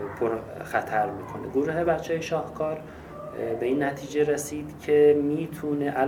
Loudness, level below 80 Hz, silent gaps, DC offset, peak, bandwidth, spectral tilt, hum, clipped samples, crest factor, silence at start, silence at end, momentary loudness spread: -26 LUFS; -54 dBFS; none; under 0.1%; -8 dBFS; 16.5 kHz; -6 dB/octave; none; under 0.1%; 18 dB; 0 s; 0 s; 14 LU